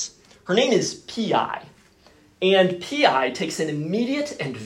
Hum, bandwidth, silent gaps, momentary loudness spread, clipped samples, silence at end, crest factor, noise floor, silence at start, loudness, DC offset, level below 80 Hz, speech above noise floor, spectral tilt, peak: none; 15.5 kHz; none; 10 LU; under 0.1%; 0 s; 20 dB; -54 dBFS; 0 s; -22 LUFS; under 0.1%; -66 dBFS; 33 dB; -4 dB/octave; -4 dBFS